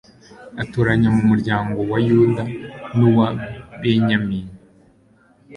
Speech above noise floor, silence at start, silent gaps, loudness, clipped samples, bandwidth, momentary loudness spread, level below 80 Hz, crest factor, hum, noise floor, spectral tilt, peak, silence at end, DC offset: 37 dB; 0.4 s; none; -18 LUFS; under 0.1%; 9.8 kHz; 14 LU; -46 dBFS; 16 dB; none; -54 dBFS; -8.5 dB/octave; -2 dBFS; 0 s; under 0.1%